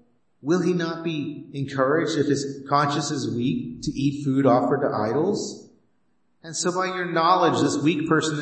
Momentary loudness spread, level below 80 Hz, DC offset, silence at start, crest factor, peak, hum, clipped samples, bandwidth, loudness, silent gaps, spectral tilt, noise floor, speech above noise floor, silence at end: 11 LU; -58 dBFS; under 0.1%; 0.45 s; 18 dB; -6 dBFS; none; under 0.1%; 8.8 kHz; -23 LUFS; none; -5.5 dB/octave; -71 dBFS; 48 dB; 0 s